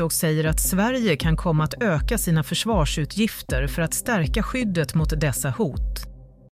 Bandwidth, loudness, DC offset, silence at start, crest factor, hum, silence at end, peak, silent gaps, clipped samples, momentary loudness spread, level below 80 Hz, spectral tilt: 16 kHz; -23 LUFS; under 0.1%; 0 s; 14 dB; none; 0.25 s; -8 dBFS; none; under 0.1%; 5 LU; -30 dBFS; -5 dB/octave